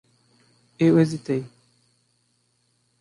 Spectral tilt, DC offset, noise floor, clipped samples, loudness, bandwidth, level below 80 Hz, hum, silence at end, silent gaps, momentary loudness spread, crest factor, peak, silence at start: -8 dB/octave; under 0.1%; -68 dBFS; under 0.1%; -22 LUFS; 11.5 kHz; -68 dBFS; 60 Hz at -55 dBFS; 1.55 s; none; 12 LU; 18 dB; -8 dBFS; 0.8 s